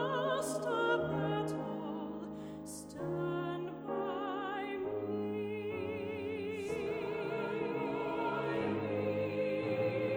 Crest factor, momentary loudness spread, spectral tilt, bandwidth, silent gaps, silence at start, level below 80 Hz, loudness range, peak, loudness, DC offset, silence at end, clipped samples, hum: 16 dB; 7 LU; -6 dB/octave; over 20 kHz; none; 0 s; -68 dBFS; 3 LU; -20 dBFS; -37 LUFS; under 0.1%; 0 s; under 0.1%; none